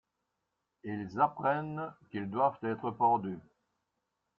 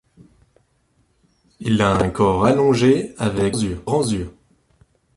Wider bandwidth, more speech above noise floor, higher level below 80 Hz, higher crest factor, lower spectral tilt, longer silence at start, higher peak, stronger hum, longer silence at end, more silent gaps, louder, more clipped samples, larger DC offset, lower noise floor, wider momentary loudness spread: second, 6.8 kHz vs 11.5 kHz; first, 52 dB vs 45 dB; second, -74 dBFS vs -42 dBFS; about the same, 20 dB vs 18 dB; first, -9 dB/octave vs -6 dB/octave; second, 0.85 s vs 1.6 s; second, -14 dBFS vs -4 dBFS; neither; first, 1 s vs 0.85 s; neither; second, -33 LUFS vs -19 LUFS; neither; neither; first, -84 dBFS vs -63 dBFS; first, 13 LU vs 9 LU